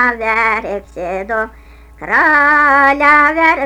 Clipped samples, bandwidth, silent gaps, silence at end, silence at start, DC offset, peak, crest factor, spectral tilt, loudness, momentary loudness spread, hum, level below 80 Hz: under 0.1%; 18.5 kHz; none; 0 s; 0 s; under 0.1%; 0 dBFS; 12 dB; -4.5 dB/octave; -11 LUFS; 15 LU; none; -40 dBFS